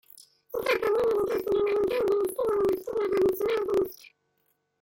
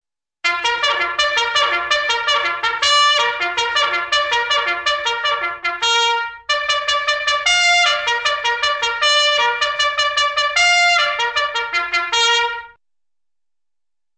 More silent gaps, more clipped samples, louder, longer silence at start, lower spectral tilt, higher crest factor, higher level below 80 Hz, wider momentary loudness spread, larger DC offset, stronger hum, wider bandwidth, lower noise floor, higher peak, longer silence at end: neither; neither; second, -27 LUFS vs -16 LUFS; second, 0.15 s vs 0.45 s; first, -5 dB/octave vs 1.5 dB/octave; about the same, 14 dB vs 16 dB; about the same, -58 dBFS vs -54 dBFS; about the same, 4 LU vs 6 LU; neither; neither; first, 17 kHz vs 9.4 kHz; second, -74 dBFS vs -90 dBFS; second, -14 dBFS vs -2 dBFS; second, 0.9 s vs 1.45 s